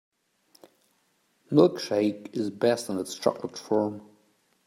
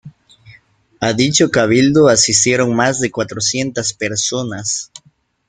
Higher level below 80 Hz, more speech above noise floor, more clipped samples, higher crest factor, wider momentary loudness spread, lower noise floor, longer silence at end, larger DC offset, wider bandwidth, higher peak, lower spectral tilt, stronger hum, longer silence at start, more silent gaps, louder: second, -76 dBFS vs -50 dBFS; first, 44 dB vs 40 dB; neither; first, 22 dB vs 16 dB; about the same, 11 LU vs 10 LU; first, -70 dBFS vs -55 dBFS; about the same, 0.65 s vs 0.65 s; neither; first, 16 kHz vs 10 kHz; second, -6 dBFS vs 0 dBFS; first, -6 dB/octave vs -3.5 dB/octave; neither; first, 1.5 s vs 0.05 s; neither; second, -27 LUFS vs -14 LUFS